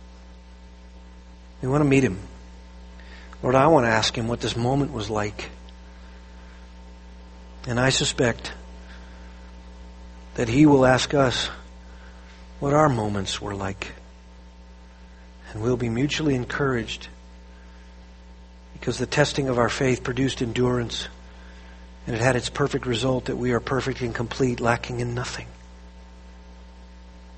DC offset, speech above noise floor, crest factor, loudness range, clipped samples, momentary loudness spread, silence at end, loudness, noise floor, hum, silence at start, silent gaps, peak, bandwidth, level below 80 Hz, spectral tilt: under 0.1%; 23 dB; 22 dB; 6 LU; under 0.1%; 26 LU; 0 s; -23 LUFS; -45 dBFS; none; 0 s; none; -4 dBFS; 8.8 kHz; -42 dBFS; -5 dB/octave